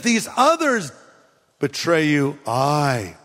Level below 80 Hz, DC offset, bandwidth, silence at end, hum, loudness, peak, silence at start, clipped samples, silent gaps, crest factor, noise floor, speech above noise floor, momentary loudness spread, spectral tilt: -62 dBFS; under 0.1%; 16 kHz; 0.1 s; none; -19 LUFS; -2 dBFS; 0 s; under 0.1%; none; 18 dB; -56 dBFS; 36 dB; 9 LU; -4.5 dB/octave